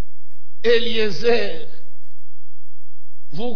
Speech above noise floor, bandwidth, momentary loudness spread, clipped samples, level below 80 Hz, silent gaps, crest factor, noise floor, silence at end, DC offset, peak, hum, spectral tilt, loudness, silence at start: 50 dB; 5.4 kHz; 16 LU; under 0.1%; -60 dBFS; none; 18 dB; -70 dBFS; 0 s; 20%; -4 dBFS; none; -5 dB/octave; -21 LUFS; 0.65 s